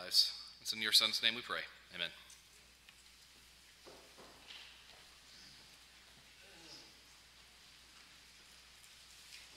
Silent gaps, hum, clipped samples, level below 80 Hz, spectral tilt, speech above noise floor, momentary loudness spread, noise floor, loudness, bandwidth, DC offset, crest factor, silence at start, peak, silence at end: none; none; under 0.1%; -74 dBFS; 0.5 dB/octave; 27 dB; 28 LU; -63 dBFS; -34 LUFS; 16 kHz; under 0.1%; 28 dB; 0 s; -14 dBFS; 0 s